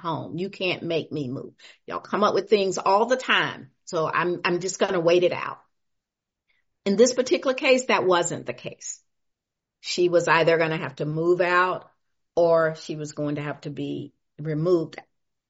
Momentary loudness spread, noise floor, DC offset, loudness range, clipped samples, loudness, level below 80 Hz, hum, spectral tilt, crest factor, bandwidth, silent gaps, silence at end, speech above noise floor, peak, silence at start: 16 LU; -85 dBFS; under 0.1%; 3 LU; under 0.1%; -23 LUFS; -68 dBFS; none; -3.5 dB/octave; 20 dB; 8 kHz; none; 0.5 s; 62 dB; -4 dBFS; 0.05 s